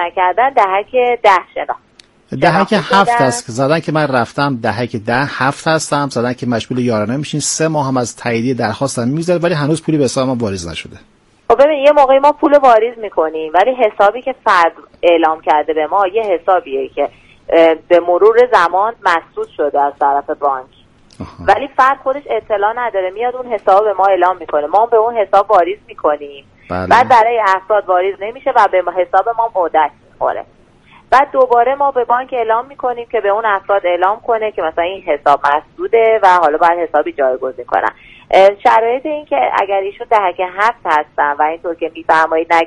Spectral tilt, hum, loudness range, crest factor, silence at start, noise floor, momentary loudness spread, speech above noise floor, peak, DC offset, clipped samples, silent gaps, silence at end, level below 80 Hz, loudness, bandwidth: -5 dB/octave; none; 4 LU; 14 dB; 0 s; -45 dBFS; 9 LU; 32 dB; 0 dBFS; under 0.1%; under 0.1%; none; 0 s; -50 dBFS; -13 LUFS; 11.5 kHz